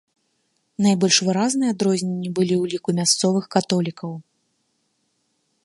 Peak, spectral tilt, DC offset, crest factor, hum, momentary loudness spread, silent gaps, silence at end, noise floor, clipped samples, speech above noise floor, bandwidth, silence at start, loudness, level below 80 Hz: -2 dBFS; -4 dB/octave; under 0.1%; 20 dB; none; 13 LU; none; 1.45 s; -70 dBFS; under 0.1%; 50 dB; 11.5 kHz; 0.8 s; -20 LUFS; -66 dBFS